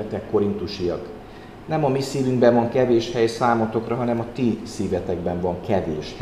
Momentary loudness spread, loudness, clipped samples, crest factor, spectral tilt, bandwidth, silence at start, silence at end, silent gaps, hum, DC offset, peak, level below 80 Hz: 10 LU; -22 LUFS; under 0.1%; 18 dB; -6.5 dB/octave; 13.5 kHz; 0 s; 0 s; none; none; 0.1%; -4 dBFS; -48 dBFS